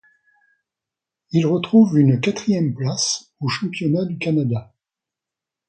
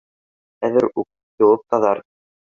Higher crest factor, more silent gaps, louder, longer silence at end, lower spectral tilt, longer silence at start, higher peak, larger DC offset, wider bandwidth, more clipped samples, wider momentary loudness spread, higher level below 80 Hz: about the same, 18 dB vs 18 dB; second, none vs 1.23-1.38 s; about the same, -19 LUFS vs -19 LUFS; first, 1.05 s vs 0.5 s; second, -5.5 dB/octave vs -7.5 dB/octave; first, 1.35 s vs 0.6 s; about the same, -4 dBFS vs -2 dBFS; neither; first, 9 kHz vs 7 kHz; neither; about the same, 9 LU vs 11 LU; about the same, -60 dBFS vs -64 dBFS